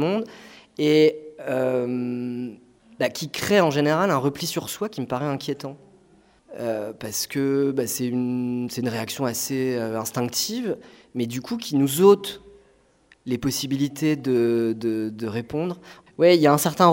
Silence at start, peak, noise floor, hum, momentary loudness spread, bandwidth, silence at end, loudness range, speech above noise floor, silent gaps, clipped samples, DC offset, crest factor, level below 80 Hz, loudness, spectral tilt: 0 s; -2 dBFS; -59 dBFS; none; 14 LU; 16.5 kHz; 0 s; 4 LU; 36 dB; none; under 0.1%; under 0.1%; 22 dB; -60 dBFS; -23 LUFS; -5 dB/octave